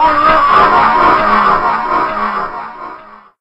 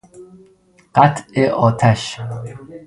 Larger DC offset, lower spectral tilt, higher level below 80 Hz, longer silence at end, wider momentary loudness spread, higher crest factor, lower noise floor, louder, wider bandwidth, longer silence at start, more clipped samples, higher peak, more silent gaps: neither; about the same, -5.5 dB/octave vs -6.5 dB/octave; first, -34 dBFS vs -50 dBFS; first, 0.25 s vs 0.1 s; first, 18 LU vs 15 LU; second, 12 dB vs 18 dB; second, -34 dBFS vs -53 dBFS; first, -10 LUFS vs -16 LUFS; second, 8.4 kHz vs 11.5 kHz; second, 0 s vs 0.15 s; neither; about the same, 0 dBFS vs 0 dBFS; neither